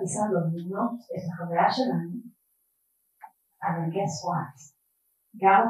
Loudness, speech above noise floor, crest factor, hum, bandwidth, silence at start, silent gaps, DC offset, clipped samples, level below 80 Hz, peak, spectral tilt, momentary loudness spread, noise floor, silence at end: -28 LUFS; 47 dB; 20 dB; none; 12.5 kHz; 0 s; none; under 0.1%; under 0.1%; -78 dBFS; -8 dBFS; -5.5 dB/octave; 11 LU; -73 dBFS; 0 s